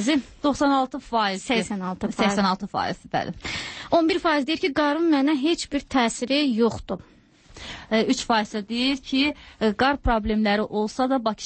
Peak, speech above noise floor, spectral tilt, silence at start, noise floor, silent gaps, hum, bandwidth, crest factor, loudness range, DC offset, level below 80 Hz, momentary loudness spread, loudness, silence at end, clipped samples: -8 dBFS; 25 dB; -4.5 dB/octave; 0 s; -48 dBFS; none; none; 8.8 kHz; 16 dB; 2 LU; under 0.1%; -42 dBFS; 8 LU; -23 LUFS; 0 s; under 0.1%